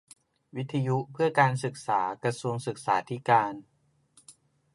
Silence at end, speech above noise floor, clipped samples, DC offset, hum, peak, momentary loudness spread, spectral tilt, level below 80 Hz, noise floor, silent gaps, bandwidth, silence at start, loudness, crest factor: 0.45 s; 36 dB; under 0.1%; under 0.1%; none; -8 dBFS; 10 LU; -6 dB/octave; -74 dBFS; -64 dBFS; none; 11.5 kHz; 0.55 s; -28 LUFS; 22 dB